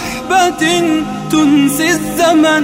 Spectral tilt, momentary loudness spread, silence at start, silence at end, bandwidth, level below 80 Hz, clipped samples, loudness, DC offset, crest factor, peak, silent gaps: -3.5 dB/octave; 5 LU; 0 s; 0 s; 16.5 kHz; -42 dBFS; under 0.1%; -12 LUFS; under 0.1%; 10 dB; -2 dBFS; none